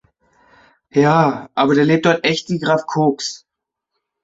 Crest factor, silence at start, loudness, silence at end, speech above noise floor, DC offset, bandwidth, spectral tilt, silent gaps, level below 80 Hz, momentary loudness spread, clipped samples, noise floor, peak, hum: 16 dB; 0.95 s; -16 LUFS; 0.9 s; 63 dB; under 0.1%; 8 kHz; -5.5 dB/octave; none; -58 dBFS; 9 LU; under 0.1%; -79 dBFS; -2 dBFS; none